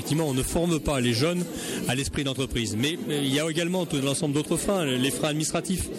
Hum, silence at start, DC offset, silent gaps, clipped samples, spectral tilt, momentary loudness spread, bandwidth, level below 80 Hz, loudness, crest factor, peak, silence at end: none; 0 s; under 0.1%; none; under 0.1%; -4.5 dB/octave; 3 LU; 16.5 kHz; -44 dBFS; -26 LUFS; 16 dB; -10 dBFS; 0 s